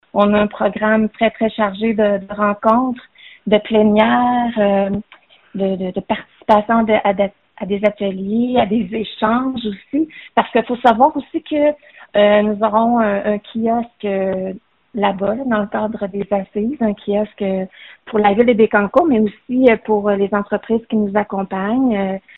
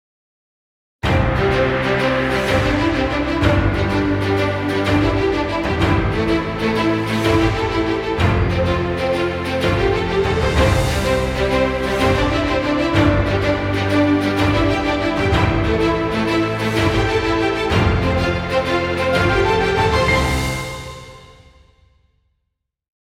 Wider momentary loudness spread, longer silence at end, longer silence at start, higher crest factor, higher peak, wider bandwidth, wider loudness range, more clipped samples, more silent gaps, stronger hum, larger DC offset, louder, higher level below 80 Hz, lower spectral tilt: first, 10 LU vs 4 LU; second, 0.2 s vs 1.8 s; second, 0.15 s vs 1.05 s; about the same, 16 dB vs 16 dB; about the same, 0 dBFS vs -2 dBFS; second, 4.2 kHz vs 15.5 kHz; first, 5 LU vs 1 LU; neither; neither; neither; neither; about the same, -17 LUFS vs -18 LUFS; second, -50 dBFS vs -28 dBFS; second, -4.5 dB/octave vs -6 dB/octave